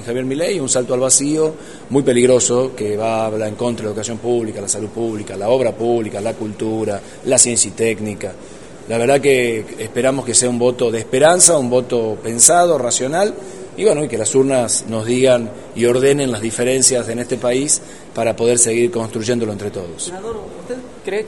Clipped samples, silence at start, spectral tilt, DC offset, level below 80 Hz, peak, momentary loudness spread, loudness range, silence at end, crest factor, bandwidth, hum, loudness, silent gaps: under 0.1%; 0 s; -3.5 dB/octave; 0.8%; -52 dBFS; 0 dBFS; 13 LU; 6 LU; 0 s; 16 dB; 12 kHz; none; -16 LUFS; none